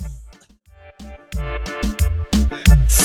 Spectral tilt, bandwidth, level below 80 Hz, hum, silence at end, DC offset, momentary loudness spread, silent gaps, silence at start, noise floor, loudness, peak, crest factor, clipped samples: -4.5 dB/octave; 16.5 kHz; -20 dBFS; none; 0 s; under 0.1%; 25 LU; none; 0 s; -49 dBFS; -19 LUFS; 0 dBFS; 18 dB; under 0.1%